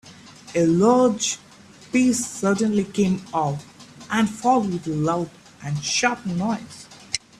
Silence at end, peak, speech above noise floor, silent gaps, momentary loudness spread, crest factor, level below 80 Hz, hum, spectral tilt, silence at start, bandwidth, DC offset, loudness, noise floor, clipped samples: 0.2 s; -4 dBFS; 23 dB; none; 13 LU; 18 dB; -58 dBFS; none; -4.5 dB/octave; 0.05 s; 14 kHz; under 0.1%; -22 LUFS; -44 dBFS; under 0.1%